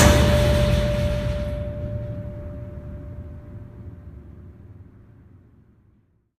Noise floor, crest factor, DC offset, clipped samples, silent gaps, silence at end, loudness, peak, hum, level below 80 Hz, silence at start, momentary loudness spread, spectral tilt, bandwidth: -61 dBFS; 24 dB; under 0.1%; under 0.1%; none; 1.55 s; -23 LUFS; 0 dBFS; none; -30 dBFS; 0 s; 25 LU; -5.5 dB/octave; 15.5 kHz